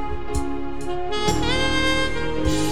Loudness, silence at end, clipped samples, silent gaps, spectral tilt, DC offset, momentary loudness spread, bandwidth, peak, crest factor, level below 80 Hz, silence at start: -23 LUFS; 0 s; under 0.1%; none; -4 dB/octave; 6%; 9 LU; over 20 kHz; -4 dBFS; 18 dB; -32 dBFS; 0 s